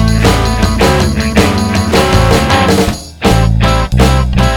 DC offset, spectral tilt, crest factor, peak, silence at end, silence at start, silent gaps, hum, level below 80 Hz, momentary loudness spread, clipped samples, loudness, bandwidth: under 0.1%; -5.5 dB/octave; 10 dB; 0 dBFS; 0 s; 0 s; none; none; -16 dBFS; 3 LU; 0.6%; -10 LUFS; 18 kHz